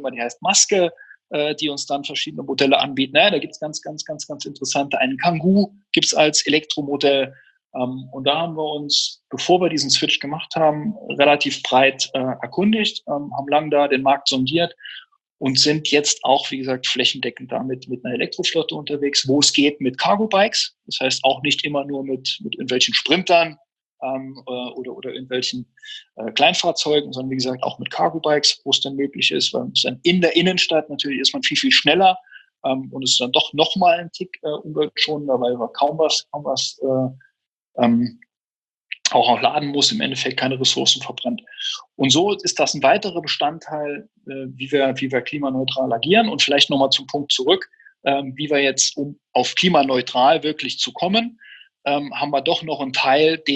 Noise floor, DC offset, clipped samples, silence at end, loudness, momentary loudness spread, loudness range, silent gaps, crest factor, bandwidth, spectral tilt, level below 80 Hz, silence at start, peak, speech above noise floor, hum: under -90 dBFS; under 0.1%; under 0.1%; 0 s; -19 LUFS; 12 LU; 4 LU; 7.65-7.70 s, 15.32-15.38 s, 23.72-23.76 s, 23.85-23.98 s, 37.47-37.65 s, 38.37-38.45 s, 38.56-38.81 s; 20 dB; 9.8 kHz; -3 dB/octave; -68 dBFS; 0 s; 0 dBFS; over 70 dB; none